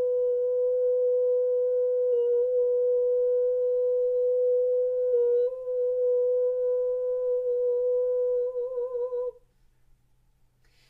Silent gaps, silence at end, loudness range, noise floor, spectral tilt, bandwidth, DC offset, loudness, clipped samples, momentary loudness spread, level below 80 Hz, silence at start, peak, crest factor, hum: none; 1.6 s; 4 LU; -64 dBFS; -6.5 dB/octave; 1.6 kHz; under 0.1%; -26 LUFS; under 0.1%; 5 LU; -66 dBFS; 0 s; -18 dBFS; 8 dB; none